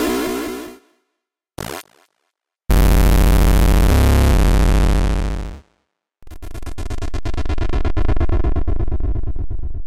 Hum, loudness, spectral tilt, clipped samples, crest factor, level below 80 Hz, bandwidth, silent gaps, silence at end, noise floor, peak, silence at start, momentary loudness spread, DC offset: none; -19 LUFS; -6 dB/octave; under 0.1%; 10 dB; -18 dBFS; 16.5 kHz; none; 0 s; -78 dBFS; -6 dBFS; 0 s; 18 LU; under 0.1%